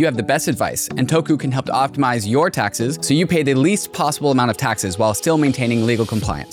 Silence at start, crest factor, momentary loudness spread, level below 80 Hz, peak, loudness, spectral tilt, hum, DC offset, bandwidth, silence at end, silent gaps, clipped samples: 0 s; 12 dB; 4 LU; -44 dBFS; -6 dBFS; -18 LUFS; -5 dB/octave; none; under 0.1%; 18.5 kHz; 0 s; none; under 0.1%